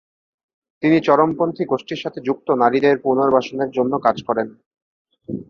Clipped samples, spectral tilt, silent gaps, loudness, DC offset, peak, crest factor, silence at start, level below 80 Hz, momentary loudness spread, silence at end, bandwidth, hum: under 0.1%; -7 dB/octave; 4.66-4.71 s, 4.82-5.05 s; -18 LUFS; under 0.1%; -2 dBFS; 18 dB; 0.8 s; -60 dBFS; 9 LU; 0.1 s; 7 kHz; none